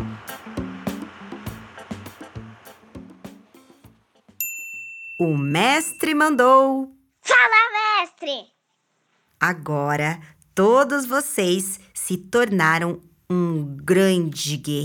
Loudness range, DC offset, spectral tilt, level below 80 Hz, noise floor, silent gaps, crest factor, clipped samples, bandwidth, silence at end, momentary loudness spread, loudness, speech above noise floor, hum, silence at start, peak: 18 LU; under 0.1%; -4.5 dB/octave; -58 dBFS; -71 dBFS; none; 20 dB; under 0.1%; over 20 kHz; 0 s; 20 LU; -20 LUFS; 51 dB; none; 0 s; -2 dBFS